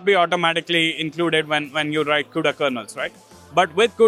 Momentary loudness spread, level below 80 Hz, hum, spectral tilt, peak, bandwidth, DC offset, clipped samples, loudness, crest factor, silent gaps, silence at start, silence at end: 8 LU; -66 dBFS; none; -4 dB/octave; -2 dBFS; 14.5 kHz; under 0.1%; under 0.1%; -20 LUFS; 18 dB; none; 0 s; 0 s